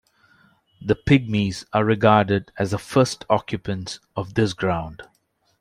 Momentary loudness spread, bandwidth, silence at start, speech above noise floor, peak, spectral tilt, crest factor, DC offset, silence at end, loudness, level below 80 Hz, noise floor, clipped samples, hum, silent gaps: 13 LU; 14 kHz; 0.8 s; 37 dB; -2 dBFS; -6 dB/octave; 20 dB; under 0.1%; 0.55 s; -22 LUFS; -48 dBFS; -58 dBFS; under 0.1%; none; none